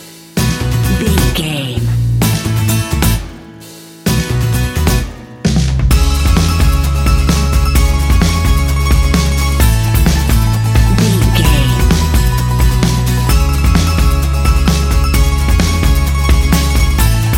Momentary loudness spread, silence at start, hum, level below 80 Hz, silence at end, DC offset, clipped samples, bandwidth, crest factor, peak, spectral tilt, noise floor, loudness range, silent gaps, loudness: 4 LU; 0 s; none; -14 dBFS; 0 s; under 0.1%; under 0.1%; 17 kHz; 10 dB; 0 dBFS; -5 dB/octave; -33 dBFS; 4 LU; none; -13 LUFS